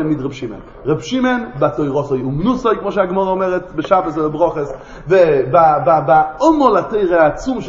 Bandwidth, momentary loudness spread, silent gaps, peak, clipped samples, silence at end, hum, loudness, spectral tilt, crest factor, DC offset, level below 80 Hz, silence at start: 7.6 kHz; 10 LU; none; 0 dBFS; under 0.1%; 0 s; none; -15 LUFS; -7 dB/octave; 14 dB; under 0.1%; -40 dBFS; 0 s